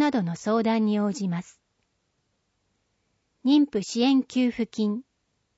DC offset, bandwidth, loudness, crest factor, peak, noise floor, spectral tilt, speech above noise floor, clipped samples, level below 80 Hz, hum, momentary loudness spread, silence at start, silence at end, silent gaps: under 0.1%; 8 kHz; -25 LUFS; 16 dB; -10 dBFS; -74 dBFS; -6 dB/octave; 50 dB; under 0.1%; -68 dBFS; none; 8 LU; 0 s; 0.55 s; none